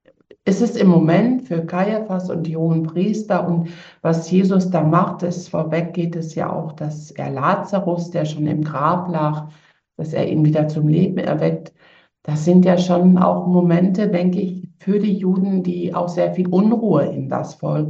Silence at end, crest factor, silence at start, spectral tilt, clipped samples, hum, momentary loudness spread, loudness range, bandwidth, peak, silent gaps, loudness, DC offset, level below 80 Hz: 0 s; 16 dB; 0.45 s; -8.5 dB/octave; under 0.1%; none; 11 LU; 5 LU; 7.6 kHz; -2 dBFS; none; -18 LUFS; under 0.1%; -64 dBFS